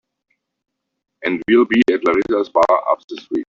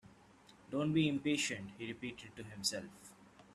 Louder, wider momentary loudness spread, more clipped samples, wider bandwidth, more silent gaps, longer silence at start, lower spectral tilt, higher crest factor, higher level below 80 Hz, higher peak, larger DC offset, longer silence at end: first, -17 LUFS vs -38 LUFS; second, 9 LU vs 19 LU; neither; second, 7.4 kHz vs 13.5 kHz; first, 3.04-3.08 s vs none; first, 1.2 s vs 0.05 s; first, -6 dB/octave vs -4 dB/octave; about the same, 16 dB vs 20 dB; first, -56 dBFS vs -72 dBFS; first, -2 dBFS vs -20 dBFS; neither; about the same, 0.05 s vs 0 s